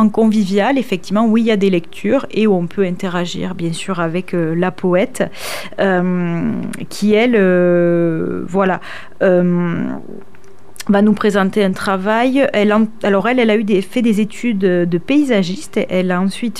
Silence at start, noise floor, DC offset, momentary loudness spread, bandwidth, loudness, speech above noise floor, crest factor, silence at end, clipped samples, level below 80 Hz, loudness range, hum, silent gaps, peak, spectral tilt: 0 s; -37 dBFS; 3%; 8 LU; 14.5 kHz; -15 LUFS; 22 dB; 14 dB; 0 s; under 0.1%; -54 dBFS; 3 LU; none; none; -2 dBFS; -6.5 dB/octave